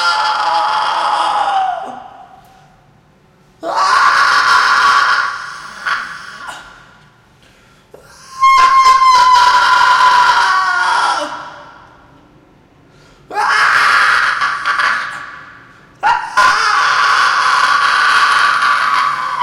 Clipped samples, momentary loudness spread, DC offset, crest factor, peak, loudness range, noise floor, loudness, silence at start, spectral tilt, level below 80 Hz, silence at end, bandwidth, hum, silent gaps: under 0.1%; 17 LU; under 0.1%; 14 dB; 0 dBFS; 8 LU; -49 dBFS; -11 LUFS; 0 s; 0 dB/octave; -50 dBFS; 0 s; 15.5 kHz; none; none